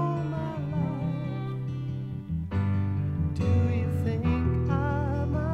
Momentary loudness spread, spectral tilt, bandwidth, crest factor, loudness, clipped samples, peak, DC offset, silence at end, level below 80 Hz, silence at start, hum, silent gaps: 7 LU; -9.5 dB/octave; 6.6 kHz; 16 dB; -29 LUFS; under 0.1%; -12 dBFS; under 0.1%; 0 s; -40 dBFS; 0 s; none; none